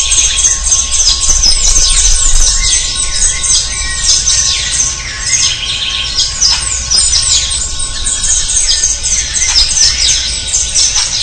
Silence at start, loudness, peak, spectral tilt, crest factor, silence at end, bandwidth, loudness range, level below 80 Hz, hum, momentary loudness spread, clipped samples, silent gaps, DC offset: 0 s; -8 LUFS; 0 dBFS; 1 dB/octave; 10 dB; 0 s; 12 kHz; 2 LU; -18 dBFS; none; 6 LU; 0.4%; none; 0.3%